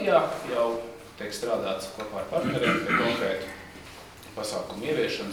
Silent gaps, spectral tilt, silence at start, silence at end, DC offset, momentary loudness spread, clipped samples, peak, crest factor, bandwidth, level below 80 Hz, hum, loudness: none; -4.5 dB/octave; 0 s; 0 s; under 0.1%; 18 LU; under 0.1%; -8 dBFS; 20 dB; over 20 kHz; -58 dBFS; none; -28 LUFS